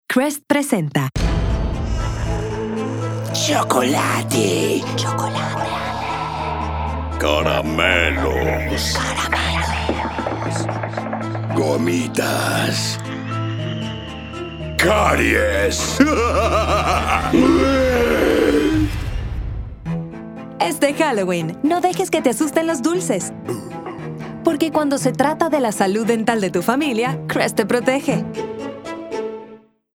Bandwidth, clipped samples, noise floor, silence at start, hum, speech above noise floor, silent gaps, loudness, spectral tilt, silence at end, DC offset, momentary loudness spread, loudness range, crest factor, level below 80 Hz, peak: 17.5 kHz; under 0.1%; -44 dBFS; 0.1 s; none; 26 dB; none; -19 LUFS; -5 dB/octave; 0.35 s; under 0.1%; 12 LU; 5 LU; 18 dB; -32 dBFS; 0 dBFS